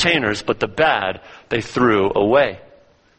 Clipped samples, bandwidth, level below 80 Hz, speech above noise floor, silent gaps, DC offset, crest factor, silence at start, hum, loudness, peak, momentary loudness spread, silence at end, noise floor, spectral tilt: under 0.1%; 8.8 kHz; -48 dBFS; 33 dB; none; under 0.1%; 18 dB; 0 s; none; -18 LUFS; -2 dBFS; 9 LU; 0.6 s; -51 dBFS; -5 dB/octave